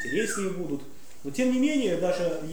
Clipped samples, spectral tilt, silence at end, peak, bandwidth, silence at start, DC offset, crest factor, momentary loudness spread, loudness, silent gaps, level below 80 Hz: under 0.1%; -4.5 dB/octave; 0 s; -14 dBFS; over 20 kHz; 0 s; 1%; 14 dB; 11 LU; -27 LUFS; none; -62 dBFS